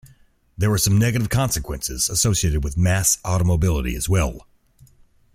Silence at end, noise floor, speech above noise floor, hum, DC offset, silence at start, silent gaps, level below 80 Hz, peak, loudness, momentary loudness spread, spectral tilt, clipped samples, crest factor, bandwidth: 0.95 s; -54 dBFS; 35 dB; none; under 0.1%; 0.05 s; none; -32 dBFS; -6 dBFS; -20 LUFS; 6 LU; -4.5 dB/octave; under 0.1%; 16 dB; 16 kHz